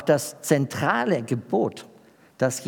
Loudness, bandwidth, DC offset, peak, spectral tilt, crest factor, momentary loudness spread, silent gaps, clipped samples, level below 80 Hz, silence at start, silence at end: -24 LUFS; 19.5 kHz; under 0.1%; -6 dBFS; -5 dB/octave; 18 dB; 5 LU; none; under 0.1%; -74 dBFS; 0 s; 0 s